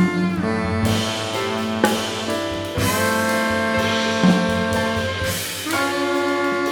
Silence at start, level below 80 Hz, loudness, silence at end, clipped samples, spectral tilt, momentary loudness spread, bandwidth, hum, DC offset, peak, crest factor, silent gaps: 0 s; -44 dBFS; -20 LUFS; 0 s; under 0.1%; -4.5 dB/octave; 5 LU; over 20 kHz; none; under 0.1%; -2 dBFS; 18 dB; none